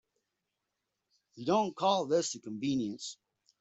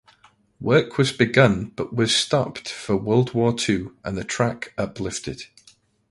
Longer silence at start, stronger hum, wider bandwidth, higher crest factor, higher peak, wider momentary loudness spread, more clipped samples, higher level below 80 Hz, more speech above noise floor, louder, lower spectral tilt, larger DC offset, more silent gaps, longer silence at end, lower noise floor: first, 1.35 s vs 0.6 s; neither; second, 8.2 kHz vs 11.5 kHz; about the same, 18 dB vs 22 dB; second, -16 dBFS vs 0 dBFS; about the same, 11 LU vs 13 LU; neither; second, -76 dBFS vs -50 dBFS; first, 54 dB vs 36 dB; second, -32 LUFS vs -22 LUFS; about the same, -4.5 dB/octave vs -5 dB/octave; neither; neither; second, 0.45 s vs 0.65 s; first, -86 dBFS vs -57 dBFS